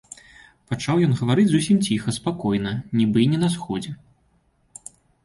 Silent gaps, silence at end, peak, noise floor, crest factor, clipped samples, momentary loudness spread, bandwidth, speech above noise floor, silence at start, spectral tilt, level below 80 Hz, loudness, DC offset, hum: none; 1.3 s; -8 dBFS; -63 dBFS; 16 dB; under 0.1%; 22 LU; 11.5 kHz; 43 dB; 0.7 s; -6 dB/octave; -54 dBFS; -21 LUFS; under 0.1%; none